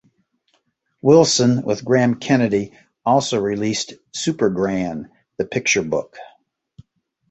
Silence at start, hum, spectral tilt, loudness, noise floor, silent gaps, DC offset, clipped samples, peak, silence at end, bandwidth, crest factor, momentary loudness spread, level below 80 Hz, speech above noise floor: 1.05 s; none; -4.5 dB/octave; -19 LUFS; -67 dBFS; none; under 0.1%; under 0.1%; -2 dBFS; 1.05 s; 8.2 kHz; 18 dB; 14 LU; -56 dBFS; 49 dB